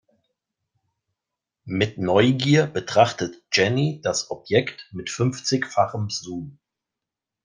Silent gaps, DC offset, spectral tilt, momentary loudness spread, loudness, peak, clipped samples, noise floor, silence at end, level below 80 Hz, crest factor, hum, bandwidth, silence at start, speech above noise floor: none; under 0.1%; -5 dB/octave; 13 LU; -22 LUFS; -2 dBFS; under 0.1%; -87 dBFS; 0.95 s; -62 dBFS; 22 dB; none; 10 kHz; 1.65 s; 65 dB